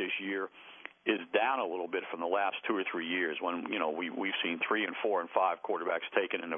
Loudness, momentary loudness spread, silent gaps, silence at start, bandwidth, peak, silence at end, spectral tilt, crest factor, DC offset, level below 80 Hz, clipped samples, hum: -33 LUFS; 6 LU; none; 0 s; 3.7 kHz; -14 dBFS; 0 s; -0.5 dB/octave; 20 dB; under 0.1%; -88 dBFS; under 0.1%; none